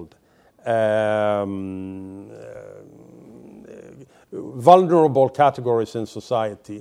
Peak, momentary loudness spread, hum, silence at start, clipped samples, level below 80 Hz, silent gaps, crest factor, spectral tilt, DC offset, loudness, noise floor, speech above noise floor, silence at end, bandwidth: 0 dBFS; 24 LU; none; 0 s; under 0.1%; -66 dBFS; none; 22 dB; -7 dB/octave; under 0.1%; -19 LUFS; -56 dBFS; 37 dB; 0 s; 12 kHz